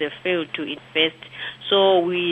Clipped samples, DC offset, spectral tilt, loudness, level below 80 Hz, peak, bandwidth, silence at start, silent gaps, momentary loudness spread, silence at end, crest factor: under 0.1%; under 0.1%; -6 dB/octave; -21 LUFS; -68 dBFS; -6 dBFS; 8.2 kHz; 0 s; none; 14 LU; 0 s; 16 dB